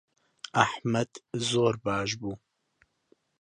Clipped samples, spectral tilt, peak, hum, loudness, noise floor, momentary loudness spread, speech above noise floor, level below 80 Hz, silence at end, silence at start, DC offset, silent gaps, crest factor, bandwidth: under 0.1%; -4.5 dB/octave; -4 dBFS; none; -29 LUFS; -70 dBFS; 13 LU; 42 dB; -62 dBFS; 1.05 s; 0.55 s; under 0.1%; none; 28 dB; 11.5 kHz